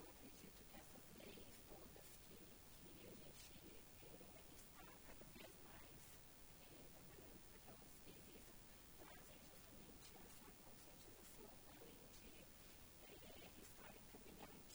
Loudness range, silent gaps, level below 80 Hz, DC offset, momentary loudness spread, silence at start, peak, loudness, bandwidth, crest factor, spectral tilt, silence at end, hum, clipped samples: 1 LU; none; -72 dBFS; under 0.1%; 2 LU; 0 s; -44 dBFS; -60 LUFS; over 20 kHz; 18 dB; -3.5 dB/octave; 0 s; none; under 0.1%